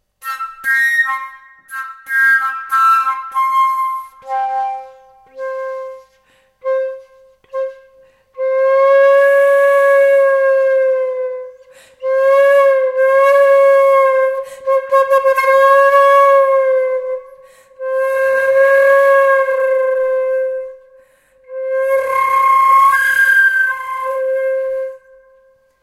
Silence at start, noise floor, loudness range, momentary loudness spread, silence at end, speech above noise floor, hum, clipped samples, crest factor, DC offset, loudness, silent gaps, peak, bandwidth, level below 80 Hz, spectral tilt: 0.25 s; -55 dBFS; 9 LU; 16 LU; 0.85 s; 40 dB; none; under 0.1%; 12 dB; under 0.1%; -13 LUFS; none; -2 dBFS; 15 kHz; -64 dBFS; 0 dB/octave